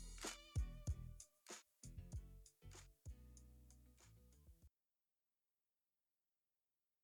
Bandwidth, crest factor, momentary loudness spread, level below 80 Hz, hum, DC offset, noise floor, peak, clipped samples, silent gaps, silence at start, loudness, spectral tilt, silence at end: 19.5 kHz; 22 dB; 19 LU; -58 dBFS; none; under 0.1%; under -90 dBFS; -34 dBFS; under 0.1%; none; 0 s; -54 LUFS; -4 dB/octave; 2.35 s